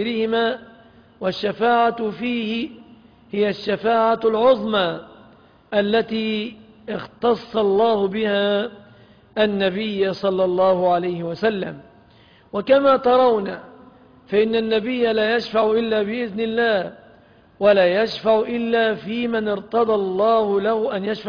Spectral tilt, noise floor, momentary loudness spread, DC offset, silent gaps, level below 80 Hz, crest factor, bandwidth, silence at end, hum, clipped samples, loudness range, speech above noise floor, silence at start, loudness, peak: -7 dB/octave; -51 dBFS; 12 LU; under 0.1%; none; -58 dBFS; 16 dB; 5.2 kHz; 0 s; none; under 0.1%; 3 LU; 32 dB; 0 s; -20 LUFS; -4 dBFS